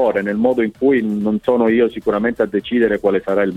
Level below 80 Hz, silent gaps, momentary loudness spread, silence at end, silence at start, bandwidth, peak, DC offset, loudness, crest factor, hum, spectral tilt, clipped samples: -48 dBFS; none; 4 LU; 0 s; 0 s; 9.2 kHz; -2 dBFS; under 0.1%; -17 LUFS; 14 dB; none; -8 dB/octave; under 0.1%